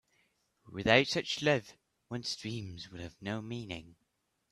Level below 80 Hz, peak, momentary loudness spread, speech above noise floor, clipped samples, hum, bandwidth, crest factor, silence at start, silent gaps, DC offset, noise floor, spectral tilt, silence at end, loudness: -64 dBFS; -10 dBFS; 18 LU; 46 dB; under 0.1%; none; 13.5 kHz; 26 dB; 0.65 s; none; under 0.1%; -80 dBFS; -4.5 dB/octave; 0.6 s; -32 LUFS